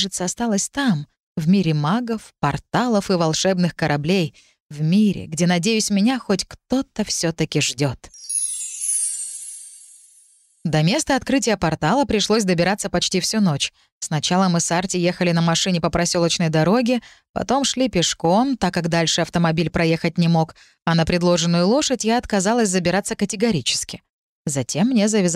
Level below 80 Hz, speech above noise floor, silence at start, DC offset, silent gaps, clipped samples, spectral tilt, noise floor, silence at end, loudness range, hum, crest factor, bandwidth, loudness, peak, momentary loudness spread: -48 dBFS; 35 dB; 0 s; under 0.1%; 1.20-1.35 s, 4.60-4.69 s, 13.92-14.01 s, 17.29-17.34 s, 24.09-24.45 s; under 0.1%; -4.5 dB/octave; -55 dBFS; 0 s; 3 LU; none; 14 dB; 15 kHz; -20 LUFS; -6 dBFS; 8 LU